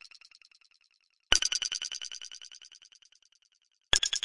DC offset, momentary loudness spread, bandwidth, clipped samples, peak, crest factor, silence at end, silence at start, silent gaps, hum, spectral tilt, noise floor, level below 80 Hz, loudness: under 0.1%; 25 LU; 11.5 kHz; under 0.1%; -4 dBFS; 30 dB; 0.05 s; 1.3 s; none; none; 1.5 dB/octave; -72 dBFS; -52 dBFS; -29 LUFS